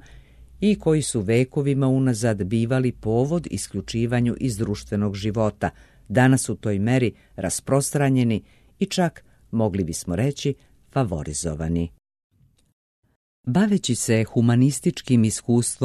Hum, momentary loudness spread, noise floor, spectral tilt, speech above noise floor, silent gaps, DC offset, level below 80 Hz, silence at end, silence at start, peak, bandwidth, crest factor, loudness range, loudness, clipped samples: none; 8 LU; -47 dBFS; -6 dB/octave; 25 dB; 12.24-12.30 s, 12.73-13.03 s, 13.16-13.44 s; under 0.1%; -46 dBFS; 0 s; 0.4 s; -6 dBFS; 13 kHz; 16 dB; 4 LU; -23 LUFS; under 0.1%